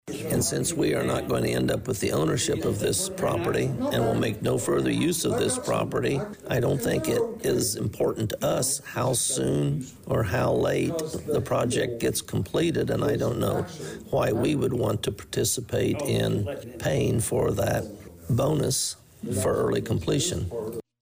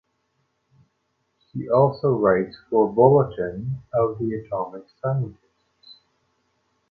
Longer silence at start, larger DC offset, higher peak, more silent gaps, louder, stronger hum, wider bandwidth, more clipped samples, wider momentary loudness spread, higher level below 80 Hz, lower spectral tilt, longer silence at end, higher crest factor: second, 0.05 s vs 1.55 s; neither; second, -16 dBFS vs -4 dBFS; neither; second, -26 LUFS vs -22 LUFS; neither; first, 16 kHz vs 4.8 kHz; neither; second, 5 LU vs 15 LU; first, -48 dBFS vs -56 dBFS; second, -5 dB/octave vs -11 dB/octave; second, 0.2 s vs 1 s; second, 10 dB vs 20 dB